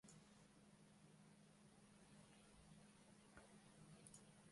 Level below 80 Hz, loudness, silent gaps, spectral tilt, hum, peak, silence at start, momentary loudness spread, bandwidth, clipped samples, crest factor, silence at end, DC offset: -84 dBFS; -68 LUFS; none; -4 dB/octave; none; -46 dBFS; 0.05 s; 5 LU; 11.5 kHz; under 0.1%; 22 dB; 0 s; under 0.1%